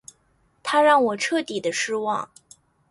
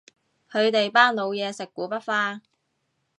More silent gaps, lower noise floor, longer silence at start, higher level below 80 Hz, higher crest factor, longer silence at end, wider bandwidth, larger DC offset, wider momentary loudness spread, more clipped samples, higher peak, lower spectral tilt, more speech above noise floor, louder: neither; second, -64 dBFS vs -74 dBFS; first, 0.65 s vs 0.5 s; first, -70 dBFS vs -82 dBFS; second, 18 dB vs 24 dB; second, 0.65 s vs 0.8 s; about the same, 11.5 kHz vs 11 kHz; neither; about the same, 13 LU vs 13 LU; neither; second, -6 dBFS vs -2 dBFS; about the same, -2.5 dB/octave vs -3.5 dB/octave; second, 43 dB vs 51 dB; about the same, -22 LUFS vs -23 LUFS